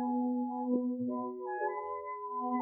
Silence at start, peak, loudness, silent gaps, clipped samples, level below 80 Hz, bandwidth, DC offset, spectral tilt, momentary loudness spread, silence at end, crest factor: 0 s; -20 dBFS; -36 LUFS; none; under 0.1%; -82 dBFS; 2.7 kHz; under 0.1%; -11 dB/octave; 6 LU; 0 s; 14 dB